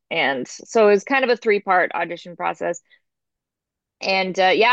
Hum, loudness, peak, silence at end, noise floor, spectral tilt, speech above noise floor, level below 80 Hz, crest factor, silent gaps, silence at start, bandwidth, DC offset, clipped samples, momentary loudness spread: none; -20 LUFS; -4 dBFS; 0 s; -85 dBFS; -3.5 dB/octave; 66 dB; -76 dBFS; 16 dB; none; 0.1 s; 8.2 kHz; under 0.1%; under 0.1%; 12 LU